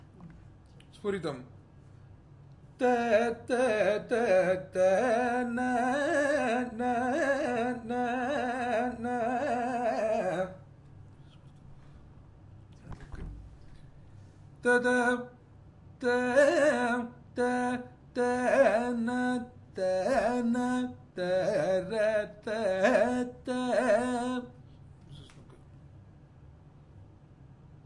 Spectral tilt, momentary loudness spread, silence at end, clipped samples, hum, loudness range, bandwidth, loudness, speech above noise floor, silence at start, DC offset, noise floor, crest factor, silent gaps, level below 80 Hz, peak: -5 dB/octave; 13 LU; 0.2 s; under 0.1%; none; 7 LU; 11.5 kHz; -29 LUFS; 26 dB; 0.2 s; under 0.1%; -54 dBFS; 20 dB; none; -58 dBFS; -10 dBFS